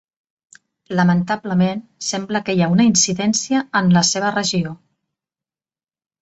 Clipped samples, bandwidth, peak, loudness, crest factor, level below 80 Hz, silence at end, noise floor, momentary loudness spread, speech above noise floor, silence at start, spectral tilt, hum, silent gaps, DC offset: under 0.1%; 8.2 kHz; -4 dBFS; -17 LUFS; 16 dB; -58 dBFS; 1.45 s; under -90 dBFS; 10 LU; over 73 dB; 0.9 s; -4 dB/octave; none; none; under 0.1%